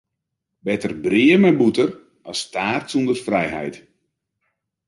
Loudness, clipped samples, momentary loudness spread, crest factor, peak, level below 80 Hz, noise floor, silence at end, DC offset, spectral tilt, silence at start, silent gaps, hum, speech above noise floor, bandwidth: -19 LUFS; under 0.1%; 15 LU; 16 dB; -4 dBFS; -58 dBFS; -80 dBFS; 1.1 s; under 0.1%; -5.5 dB/octave; 0.65 s; none; none; 61 dB; 11.5 kHz